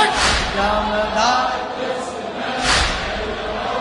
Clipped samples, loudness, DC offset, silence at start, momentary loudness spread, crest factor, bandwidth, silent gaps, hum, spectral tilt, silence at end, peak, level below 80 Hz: under 0.1%; -19 LUFS; under 0.1%; 0 s; 8 LU; 18 dB; 11 kHz; none; none; -2.5 dB/octave; 0 s; -2 dBFS; -32 dBFS